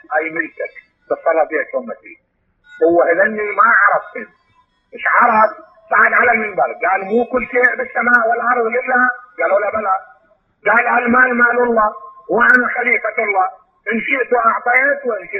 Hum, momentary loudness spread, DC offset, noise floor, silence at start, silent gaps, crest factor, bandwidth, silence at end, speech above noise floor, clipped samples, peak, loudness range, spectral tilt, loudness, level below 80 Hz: none; 11 LU; under 0.1%; -58 dBFS; 0.1 s; none; 16 dB; 5.8 kHz; 0 s; 43 dB; under 0.1%; 0 dBFS; 2 LU; -7 dB/octave; -14 LUFS; -56 dBFS